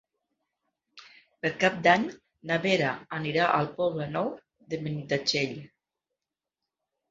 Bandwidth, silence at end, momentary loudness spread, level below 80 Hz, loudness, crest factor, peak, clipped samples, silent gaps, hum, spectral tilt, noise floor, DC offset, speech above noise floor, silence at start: 7.8 kHz; 1.45 s; 13 LU; -68 dBFS; -27 LUFS; 24 dB; -6 dBFS; under 0.1%; none; none; -5 dB/octave; -88 dBFS; under 0.1%; 61 dB; 0.95 s